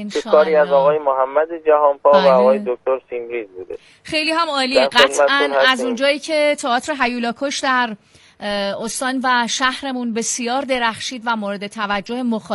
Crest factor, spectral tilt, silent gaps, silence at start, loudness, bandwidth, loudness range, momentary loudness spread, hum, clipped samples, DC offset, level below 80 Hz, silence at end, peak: 18 dB; -2.5 dB/octave; none; 0 s; -17 LUFS; 11.5 kHz; 4 LU; 12 LU; none; under 0.1%; under 0.1%; -58 dBFS; 0 s; 0 dBFS